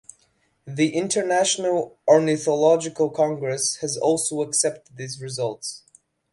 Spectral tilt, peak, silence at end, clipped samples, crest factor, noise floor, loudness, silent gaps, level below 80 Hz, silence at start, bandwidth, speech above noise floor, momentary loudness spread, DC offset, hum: -3.5 dB/octave; -4 dBFS; 0.55 s; under 0.1%; 20 dB; -65 dBFS; -22 LUFS; none; -68 dBFS; 0.65 s; 11.5 kHz; 43 dB; 15 LU; under 0.1%; none